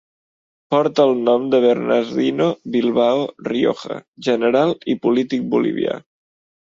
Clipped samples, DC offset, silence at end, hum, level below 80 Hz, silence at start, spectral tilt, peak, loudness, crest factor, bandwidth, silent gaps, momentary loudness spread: under 0.1%; under 0.1%; 0.7 s; none; -64 dBFS; 0.7 s; -6.5 dB/octave; -2 dBFS; -18 LUFS; 16 dB; 7.6 kHz; 4.08-4.13 s; 8 LU